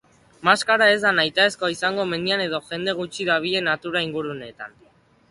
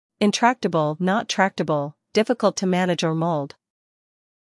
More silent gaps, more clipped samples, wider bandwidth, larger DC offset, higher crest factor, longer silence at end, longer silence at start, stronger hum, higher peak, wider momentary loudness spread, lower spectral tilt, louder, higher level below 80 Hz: neither; neither; about the same, 11.5 kHz vs 12 kHz; neither; about the same, 20 dB vs 18 dB; second, 0.6 s vs 0.95 s; first, 0.4 s vs 0.2 s; neither; about the same, -2 dBFS vs -4 dBFS; first, 14 LU vs 5 LU; second, -3.5 dB/octave vs -5 dB/octave; about the same, -21 LUFS vs -22 LUFS; first, -64 dBFS vs -72 dBFS